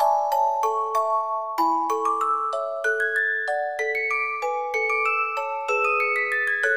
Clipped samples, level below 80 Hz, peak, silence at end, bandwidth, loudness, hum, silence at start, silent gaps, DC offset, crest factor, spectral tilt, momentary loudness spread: under 0.1%; -78 dBFS; -8 dBFS; 0 s; 15.5 kHz; -23 LUFS; none; 0 s; none; 0.2%; 14 dB; -0.5 dB/octave; 4 LU